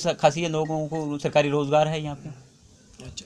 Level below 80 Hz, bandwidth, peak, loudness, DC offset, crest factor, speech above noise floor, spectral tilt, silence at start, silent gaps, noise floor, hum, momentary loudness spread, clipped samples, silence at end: -58 dBFS; 11 kHz; -4 dBFS; -24 LUFS; under 0.1%; 22 dB; 29 dB; -5.5 dB/octave; 0 s; none; -53 dBFS; none; 17 LU; under 0.1%; 0 s